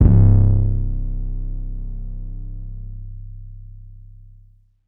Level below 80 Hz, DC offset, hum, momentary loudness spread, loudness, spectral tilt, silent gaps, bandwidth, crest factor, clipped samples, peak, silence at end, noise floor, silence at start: -22 dBFS; under 0.1%; none; 25 LU; -19 LUFS; -14.5 dB/octave; none; 1.7 kHz; 18 dB; under 0.1%; 0 dBFS; 0.9 s; -50 dBFS; 0 s